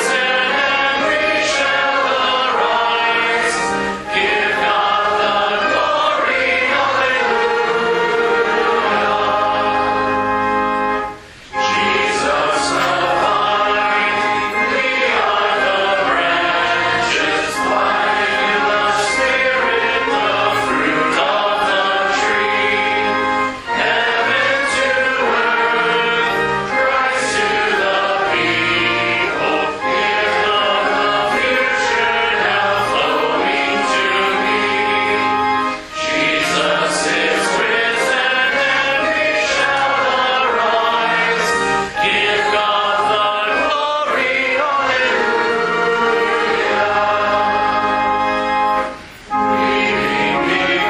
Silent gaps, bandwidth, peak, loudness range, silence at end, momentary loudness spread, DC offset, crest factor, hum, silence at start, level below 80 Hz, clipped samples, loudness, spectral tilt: none; 15 kHz; -2 dBFS; 1 LU; 0 s; 2 LU; under 0.1%; 14 dB; none; 0 s; -48 dBFS; under 0.1%; -15 LUFS; -2.5 dB/octave